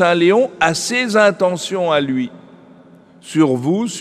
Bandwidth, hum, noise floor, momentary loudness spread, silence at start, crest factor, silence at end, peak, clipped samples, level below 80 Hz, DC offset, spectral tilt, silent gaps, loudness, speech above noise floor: 14.5 kHz; none; -45 dBFS; 8 LU; 0 s; 16 dB; 0 s; 0 dBFS; under 0.1%; -62 dBFS; under 0.1%; -4.5 dB/octave; none; -16 LUFS; 29 dB